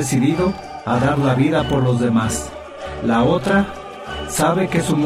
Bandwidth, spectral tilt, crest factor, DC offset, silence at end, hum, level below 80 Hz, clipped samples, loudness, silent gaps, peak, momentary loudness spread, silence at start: 15 kHz; -5.5 dB/octave; 14 dB; under 0.1%; 0 s; none; -38 dBFS; under 0.1%; -18 LUFS; none; -4 dBFS; 13 LU; 0 s